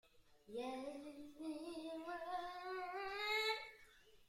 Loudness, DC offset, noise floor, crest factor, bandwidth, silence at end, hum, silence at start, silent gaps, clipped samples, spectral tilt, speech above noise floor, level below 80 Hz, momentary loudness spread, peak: -45 LUFS; under 0.1%; -66 dBFS; 18 dB; 16 kHz; 0 s; none; 0.05 s; none; under 0.1%; -2 dB/octave; 18 dB; -76 dBFS; 14 LU; -30 dBFS